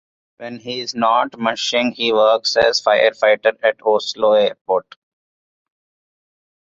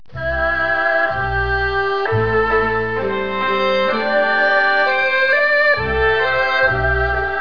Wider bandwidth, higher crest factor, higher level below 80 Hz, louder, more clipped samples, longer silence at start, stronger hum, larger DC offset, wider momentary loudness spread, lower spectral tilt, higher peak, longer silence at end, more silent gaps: first, 7.8 kHz vs 5.4 kHz; about the same, 16 dB vs 14 dB; second, -60 dBFS vs -32 dBFS; about the same, -17 LUFS vs -16 LUFS; neither; first, 0.4 s vs 0.15 s; neither; second, under 0.1% vs 2%; first, 11 LU vs 6 LU; second, -2.5 dB/octave vs -6.5 dB/octave; about the same, -2 dBFS vs -4 dBFS; first, 1.85 s vs 0 s; first, 4.61-4.65 s vs none